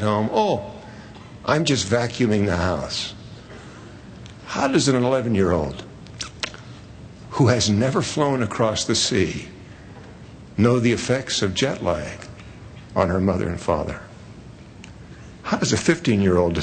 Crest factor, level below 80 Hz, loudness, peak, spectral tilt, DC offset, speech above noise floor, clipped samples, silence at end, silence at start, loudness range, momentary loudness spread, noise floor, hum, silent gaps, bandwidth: 20 dB; -46 dBFS; -21 LUFS; -2 dBFS; -5 dB/octave; under 0.1%; 21 dB; under 0.1%; 0 s; 0 s; 3 LU; 23 LU; -41 dBFS; none; none; 9.4 kHz